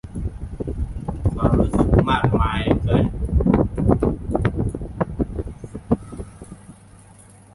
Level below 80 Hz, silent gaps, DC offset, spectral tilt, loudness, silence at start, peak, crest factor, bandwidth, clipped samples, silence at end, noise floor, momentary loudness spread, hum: -28 dBFS; none; under 0.1%; -8.5 dB/octave; -21 LUFS; 0.05 s; -2 dBFS; 18 dB; 11.5 kHz; under 0.1%; 0.85 s; -47 dBFS; 15 LU; none